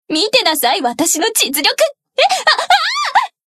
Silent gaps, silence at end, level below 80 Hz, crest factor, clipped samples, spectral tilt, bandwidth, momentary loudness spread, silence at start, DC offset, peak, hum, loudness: none; 0.25 s; -66 dBFS; 14 dB; under 0.1%; 0 dB/octave; 14.5 kHz; 4 LU; 0.1 s; under 0.1%; 0 dBFS; none; -13 LUFS